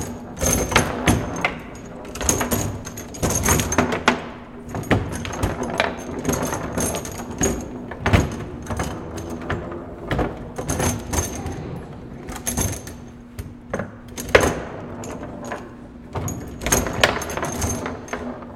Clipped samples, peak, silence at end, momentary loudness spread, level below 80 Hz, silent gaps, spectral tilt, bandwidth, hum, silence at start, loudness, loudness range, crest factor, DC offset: under 0.1%; 0 dBFS; 0 s; 15 LU; -36 dBFS; none; -4 dB/octave; 17 kHz; none; 0 s; -23 LUFS; 5 LU; 24 dB; under 0.1%